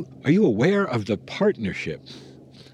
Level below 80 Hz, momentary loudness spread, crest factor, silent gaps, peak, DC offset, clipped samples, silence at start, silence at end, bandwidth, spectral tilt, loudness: -58 dBFS; 18 LU; 16 dB; none; -6 dBFS; under 0.1%; under 0.1%; 0 s; 0.1 s; 10 kHz; -7.5 dB/octave; -23 LUFS